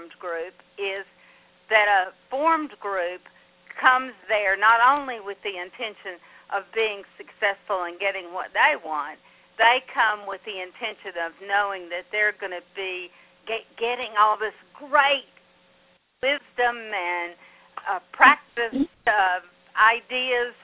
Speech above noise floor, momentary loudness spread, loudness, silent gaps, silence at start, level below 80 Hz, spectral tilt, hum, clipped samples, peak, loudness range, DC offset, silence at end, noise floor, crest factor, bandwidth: 37 dB; 15 LU; -23 LUFS; none; 0 s; -66 dBFS; -5 dB/octave; none; under 0.1%; 0 dBFS; 6 LU; under 0.1%; 0.1 s; -61 dBFS; 24 dB; 4 kHz